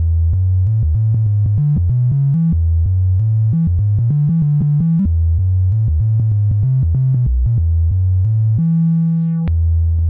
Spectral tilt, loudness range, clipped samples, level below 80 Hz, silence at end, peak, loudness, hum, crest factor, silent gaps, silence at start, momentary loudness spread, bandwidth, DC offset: -14 dB/octave; 0 LU; under 0.1%; -22 dBFS; 0 s; -8 dBFS; -15 LUFS; none; 6 dB; none; 0 s; 1 LU; 1.6 kHz; under 0.1%